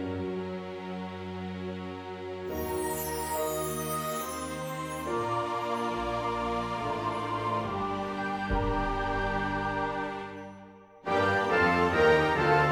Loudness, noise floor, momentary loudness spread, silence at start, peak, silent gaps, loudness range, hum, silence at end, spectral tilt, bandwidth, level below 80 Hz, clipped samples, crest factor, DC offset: -30 LUFS; -50 dBFS; 14 LU; 0 s; -12 dBFS; none; 6 LU; none; 0 s; -5 dB/octave; over 20 kHz; -46 dBFS; under 0.1%; 18 dB; under 0.1%